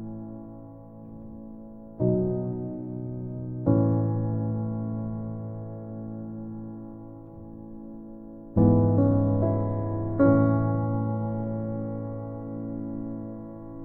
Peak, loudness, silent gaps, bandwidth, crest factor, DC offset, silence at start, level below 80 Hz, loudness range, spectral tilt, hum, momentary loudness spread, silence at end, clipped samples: -8 dBFS; -27 LUFS; none; 2.3 kHz; 20 dB; under 0.1%; 0 s; -48 dBFS; 11 LU; -14 dB/octave; none; 21 LU; 0 s; under 0.1%